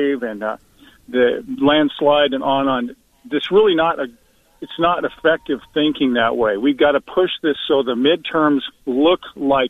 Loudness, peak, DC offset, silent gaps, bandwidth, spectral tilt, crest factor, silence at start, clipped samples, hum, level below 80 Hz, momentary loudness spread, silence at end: -18 LUFS; -4 dBFS; under 0.1%; none; 4 kHz; -6.5 dB/octave; 14 dB; 0 s; under 0.1%; none; -52 dBFS; 9 LU; 0 s